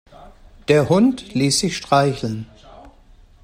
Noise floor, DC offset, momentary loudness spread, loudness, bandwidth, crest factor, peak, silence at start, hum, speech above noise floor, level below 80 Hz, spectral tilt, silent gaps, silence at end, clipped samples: -48 dBFS; under 0.1%; 16 LU; -18 LUFS; 16 kHz; 18 dB; -2 dBFS; 0.2 s; none; 31 dB; -48 dBFS; -5 dB/octave; none; 0.55 s; under 0.1%